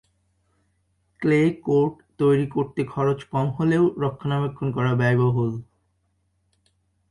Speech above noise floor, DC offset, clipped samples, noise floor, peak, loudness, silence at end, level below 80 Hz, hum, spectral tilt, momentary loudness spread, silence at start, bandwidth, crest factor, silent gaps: 48 dB; under 0.1%; under 0.1%; -69 dBFS; -8 dBFS; -23 LUFS; 1.5 s; -56 dBFS; none; -8.5 dB/octave; 7 LU; 1.2 s; 11 kHz; 16 dB; none